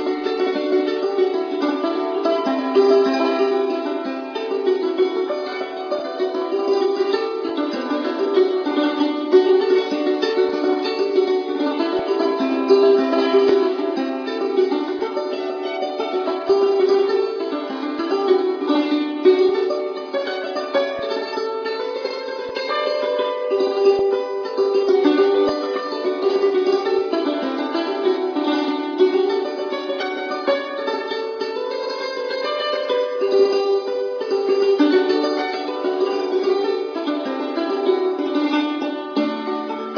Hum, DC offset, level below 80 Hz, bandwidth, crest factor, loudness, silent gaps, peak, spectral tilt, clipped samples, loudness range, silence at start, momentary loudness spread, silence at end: none; under 0.1%; -68 dBFS; 5.4 kHz; 16 dB; -20 LUFS; none; -2 dBFS; -4.5 dB/octave; under 0.1%; 4 LU; 0 s; 9 LU; 0 s